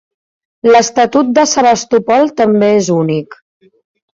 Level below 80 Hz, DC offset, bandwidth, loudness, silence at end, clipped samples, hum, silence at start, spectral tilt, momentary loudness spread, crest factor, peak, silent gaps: -54 dBFS; under 0.1%; 7.8 kHz; -11 LUFS; 0.8 s; under 0.1%; none; 0.65 s; -4.5 dB/octave; 5 LU; 12 dB; 0 dBFS; none